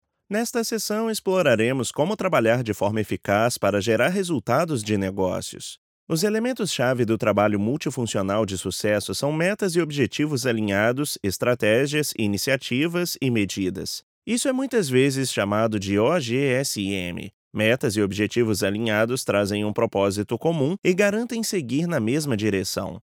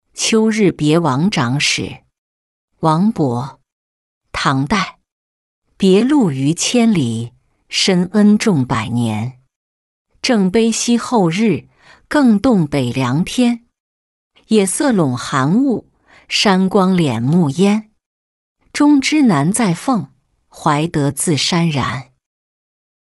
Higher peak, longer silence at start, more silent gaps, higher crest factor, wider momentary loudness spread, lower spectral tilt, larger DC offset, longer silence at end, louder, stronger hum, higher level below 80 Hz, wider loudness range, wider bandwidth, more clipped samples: about the same, -4 dBFS vs -2 dBFS; first, 0.3 s vs 0.15 s; second, 5.78-6.07 s, 14.03-14.22 s, 17.33-17.51 s vs 2.18-2.68 s, 3.72-4.21 s, 5.12-5.62 s, 9.56-10.05 s, 13.80-14.31 s, 18.06-18.56 s; about the same, 18 dB vs 14 dB; second, 6 LU vs 9 LU; about the same, -5 dB/octave vs -5 dB/octave; neither; second, 0.1 s vs 1.15 s; second, -23 LUFS vs -15 LUFS; neither; second, -64 dBFS vs -48 dBFS; about the same, 2 LU vs 4 LU; first, 19 kHz vs 12 kHz; neither